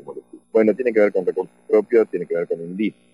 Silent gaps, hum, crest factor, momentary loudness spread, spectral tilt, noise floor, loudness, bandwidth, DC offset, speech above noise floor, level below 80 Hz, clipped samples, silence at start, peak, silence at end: none; none; 16 dB; 10 LU; -8.5 dB/octave; -38 dBFS; -20 LUFS; 9.8 kHz; under 0.1%; 18 dB; -74 dBFS; under 0.1%; 0.05 s; -4 dBFS; 0.25 s